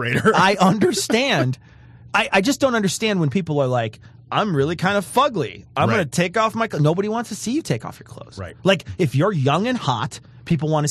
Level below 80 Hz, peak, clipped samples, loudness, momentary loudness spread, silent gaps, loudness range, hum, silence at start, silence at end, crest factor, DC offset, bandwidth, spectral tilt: -50 dBFS; -4 dBFS; under 0.1%; -20 LUFS; 10 LU; none; 3 LU; none; 0 s; 0 s; 16 dB; under 0.1%; 13 kHz; -5 dB/octave